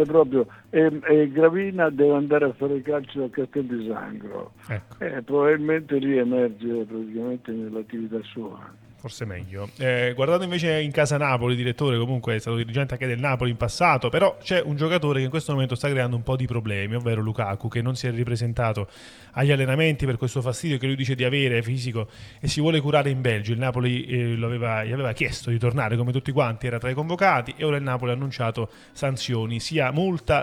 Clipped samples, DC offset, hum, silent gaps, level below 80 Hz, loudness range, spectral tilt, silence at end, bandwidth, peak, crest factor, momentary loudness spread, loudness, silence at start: under 0.1%; under 0.1%; none; none; -50 dBFS; 4 LU; -6.5 dB/octave; 0 s; 13 kHz; -4 dBFS; 20 dB; 12 LU; -24 LUFS; 0 s